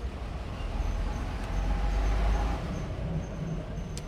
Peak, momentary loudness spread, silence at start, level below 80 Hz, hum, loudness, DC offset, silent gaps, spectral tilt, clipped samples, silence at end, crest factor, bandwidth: -16 dBFS; 8 LU; 0 s; -32 dBFS; none; -33 LUFS; under 0.1%; none; -6.5 dB/octave; under 0.1%; 0 s; 14 dB; 10 kHz